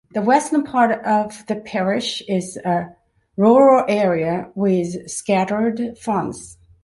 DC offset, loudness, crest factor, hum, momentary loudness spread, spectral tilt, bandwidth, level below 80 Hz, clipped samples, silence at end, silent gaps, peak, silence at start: under 0.1%; -19 LUFS; 16 dB; none; 12 LU; -5.5 dB/octave; 11.5 kHz; -58 dBFS; under 0.1%; 0.3 s; none; -2 dBFS; 0.15 s